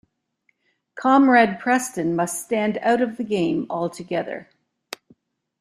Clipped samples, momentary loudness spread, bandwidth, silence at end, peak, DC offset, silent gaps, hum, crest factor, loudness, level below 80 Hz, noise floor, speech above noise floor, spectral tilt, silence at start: under 0.1%; 22 LU; 14.5 kHz; 1.2 s; -4 dBFS; under 0.1%; none; none; 18 dB; -21 LUFS; -66 dBFS; -69 dBFS; 49 dB; -5 dB/octave; 0.95 s